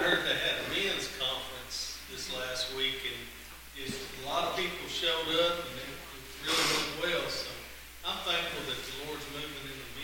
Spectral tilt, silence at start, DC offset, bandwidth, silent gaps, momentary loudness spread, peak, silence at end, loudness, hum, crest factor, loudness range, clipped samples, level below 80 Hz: -2 dB/octave; 0 s; under 0.1%; 17 kHz; none; 13 LU; -12 dBFS; 0 s; -32 LUFS; none; 22 dB; 4 LU; under 0.1%; -56 dBFS